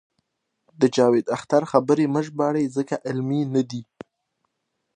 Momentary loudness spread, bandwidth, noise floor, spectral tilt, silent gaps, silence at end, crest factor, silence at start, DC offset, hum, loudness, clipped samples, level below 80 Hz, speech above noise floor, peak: 8 LU; 9.8 kHz; -77 dBFS; -6.5 dB/octave; none; 1.15 s; 20 dB; 0.8 s; under 0.1%; none; -22 LUFS; under 0.1%; -72 dBFS; 56 dB; -2 dBFS